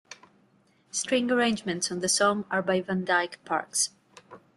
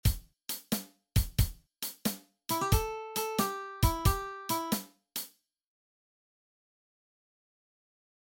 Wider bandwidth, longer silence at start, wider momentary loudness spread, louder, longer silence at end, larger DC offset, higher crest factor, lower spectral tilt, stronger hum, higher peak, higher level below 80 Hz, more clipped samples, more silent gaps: second, 12.5 kHz vs 17 kHz; about the same, 0.1 s vs 0.05 s; second, 7 LU vs 10 LU; first, -26 LUFS vs -33 LUFS; second, 0.2 s vs 3.1 s; neither; about the same, 18 dB vs 22 dB; second, -3 dB/octave vs -4.5 dB/octave; neither; about the same, -10 dBFS vs -12 dBFS; second, -70 dBFS vs -40 dBFS; neither; neither